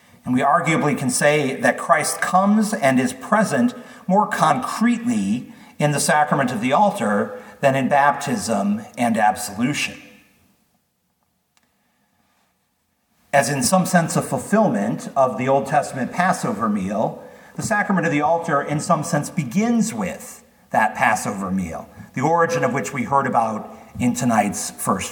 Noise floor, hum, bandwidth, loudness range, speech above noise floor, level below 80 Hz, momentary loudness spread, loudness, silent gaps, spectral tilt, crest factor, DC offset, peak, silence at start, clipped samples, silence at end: -68 dBFS; none; 19 kHz; 5 LU; 49 dB; -60 dBFS; 8 LU; -20 LUFS; none; -5 dB/octave; 18 dB; under 0.1%; -2 dBFS; 0.25 s; under 0.1%; 0 s